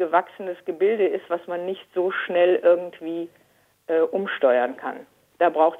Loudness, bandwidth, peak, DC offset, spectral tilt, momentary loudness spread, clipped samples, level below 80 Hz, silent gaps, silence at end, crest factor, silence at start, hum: -23 LUFS; 4 kHz; -4 dBFS; under 0.1%; -6.5 dB/octave; 14 LU; under 0.1%; -78 dBFS; none; 0 s; 18 dB; 0 s; none